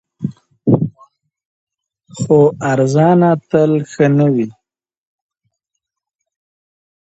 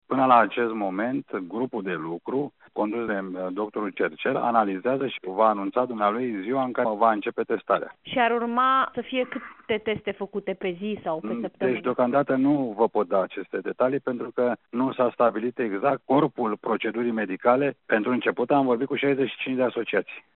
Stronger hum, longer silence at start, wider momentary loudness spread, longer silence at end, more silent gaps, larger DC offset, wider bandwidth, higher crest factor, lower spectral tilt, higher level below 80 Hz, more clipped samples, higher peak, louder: neither; about the same, 0.2 s vs 0.1 s; first, 14 LU vs 8 LU; first, 2.5 s vs 0.15 s; first, 1.45-1.67 s vs none; neither; first, 8.2 kHz vs 4.2 kHz; about the same, 16 dB vs 20 dB; first, -8 dB/octave vs -4 dB/octave; first, -54 dBFS vs -70 dBFS; neither; first, 0 dBFS vs -4 dBFS; first, -14 LUFS vs -25 LUFS